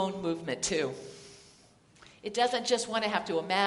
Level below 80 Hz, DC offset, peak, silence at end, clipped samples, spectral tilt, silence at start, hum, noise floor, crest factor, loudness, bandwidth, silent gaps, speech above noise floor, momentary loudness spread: -66 dBFS; under 0.1%; -10 dBFS; 0 s; under 0.1%; -3 dB/octave; 0 s; none; -60 dBFS; 22 dB; -31 LUFS; 11.5 kHz; none; 30 dB; 17 LU